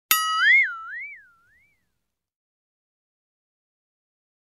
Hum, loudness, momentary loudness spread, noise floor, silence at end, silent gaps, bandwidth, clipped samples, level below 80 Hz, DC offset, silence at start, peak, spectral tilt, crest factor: none; -18 LUFS; 19 LU; -80 dBFS; 3.3 s; none; 15.5 kHz; under 0.1%; -80 dBFS; under 0.1%; 0.1 s; 0 dBFS; 4 dB/octave; 28 dB